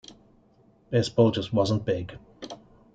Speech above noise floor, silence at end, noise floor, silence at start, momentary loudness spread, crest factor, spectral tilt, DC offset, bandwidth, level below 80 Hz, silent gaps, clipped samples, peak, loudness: 36 dB; 0.4 s; -60 dBFS; 0.9 s; 20 LU; 20 dB; -6.5 dB/octave; under 0.1%; 9.2 kHz; -58 dBFS; none; under 0.1%; -8 dBFS; -25 LUFS